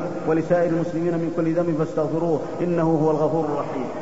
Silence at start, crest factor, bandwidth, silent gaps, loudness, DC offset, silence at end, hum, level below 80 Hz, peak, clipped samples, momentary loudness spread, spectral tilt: 0 s; 14 dB; 8 kHz; none; -22 LUFS; 1%; 0 s; none; -56 dBFS; -8 dBFS; under 0.1%; 4 LU; -8.5 dB/octave